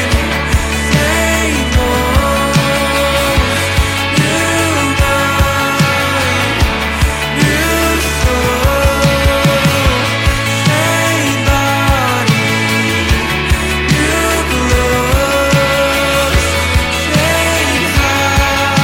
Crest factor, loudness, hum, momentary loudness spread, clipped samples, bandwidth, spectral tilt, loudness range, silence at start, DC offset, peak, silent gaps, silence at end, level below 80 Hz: 12 dB; -12 LUFS; none; 2 LU; under 0.1%; 17 kHz; -4 dB/octave; 1 LU; 0 s; under 0.1%; 0 dBFS; none; 0 s; -20 dBFS